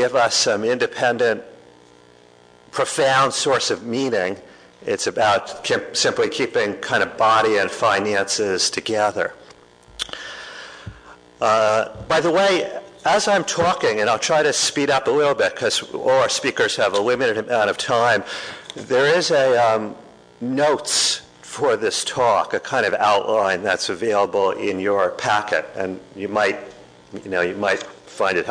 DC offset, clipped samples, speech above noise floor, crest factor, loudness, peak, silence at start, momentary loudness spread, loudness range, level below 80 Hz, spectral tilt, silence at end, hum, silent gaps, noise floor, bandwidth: under 0.1%; under 0.1%; 30 dB; 14 dB; -19 LUFS; -6 dBFS; 0 s; 12 LU; 4 LU; -58 dBFS; -2.5 dB/octave; 0 s; none; none; -50 dBFS; 11 kHz